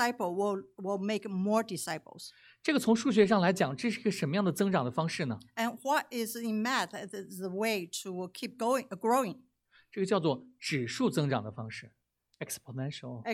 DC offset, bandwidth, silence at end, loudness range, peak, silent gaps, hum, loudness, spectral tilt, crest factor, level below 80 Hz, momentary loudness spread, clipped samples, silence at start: under 0.1%; 16.5 kHz; 0 s; 5 LU; -12 dBFS; none; none; -32 LUFS; -5 dB/octave; 20 dB; -76 dBFS; 13 LU; under 0.1%; 0 s